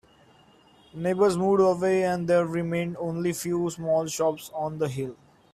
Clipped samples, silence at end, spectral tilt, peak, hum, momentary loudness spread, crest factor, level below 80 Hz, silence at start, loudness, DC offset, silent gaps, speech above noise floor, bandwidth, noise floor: under 0.1%; 0.4 s; -6 dB/octave; -10 dBFS; none; 11 LU; 16 dB; -62 dBFS; 0.95 s; -26 LUFS; under 0.1%; none; 32 dB; 15.5 kHz; -57 dBFS